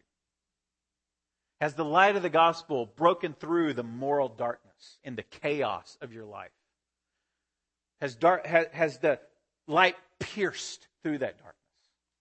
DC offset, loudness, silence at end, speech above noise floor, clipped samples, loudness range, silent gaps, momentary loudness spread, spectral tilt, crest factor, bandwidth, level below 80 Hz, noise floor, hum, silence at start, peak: under 0.1%; -28 LUFS; 0.9 s; 60 dB; under 0.1%; 10 LU; none; 18 LU; -5 dB/octave; 24 dB; 8.8 kHz; -74 dBFS; -88 dBFS; none; 1.6 s; -6 dBFS